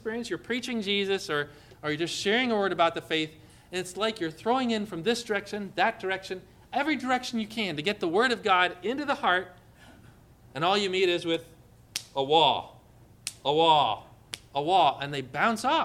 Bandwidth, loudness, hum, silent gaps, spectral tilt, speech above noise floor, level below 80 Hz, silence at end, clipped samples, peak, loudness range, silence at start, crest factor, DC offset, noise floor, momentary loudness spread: 16 kHz; -27 LUFS; 60 Hz at -60 dBFS; none; -3.5 dB/octave; 28 dB; -64 dBFS; 0 s; under 0.1%; -8 dBFS; 3 LU; 0.05 s; 20 dB; under 0.1%; -55 dBFS; 13 LU